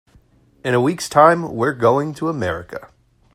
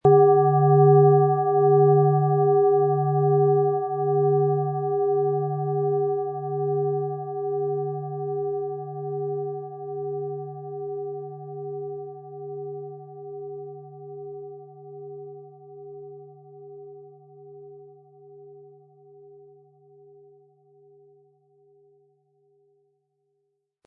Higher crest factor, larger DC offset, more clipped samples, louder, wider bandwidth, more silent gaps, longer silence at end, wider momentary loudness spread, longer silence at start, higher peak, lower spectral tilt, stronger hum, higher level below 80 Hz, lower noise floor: about the same, 18 dB vs 18 dB; neither; neither; first, -17 LUFS vs -22 LUFS; first, 15.5 kHz vs 1.8 kHz; neither; second, 0.5 s vs 5.2 s; second, 16 LU vs 24 LU; first, 0.65 s vs 0.05 s; first, 0 dBFS vs -6 dBFS; second, -6 dB/octave vs -14 dB/octave; neither; first, -54 dBFS vs -68 dBFS; second, -53 dBFS vs -76 dBFS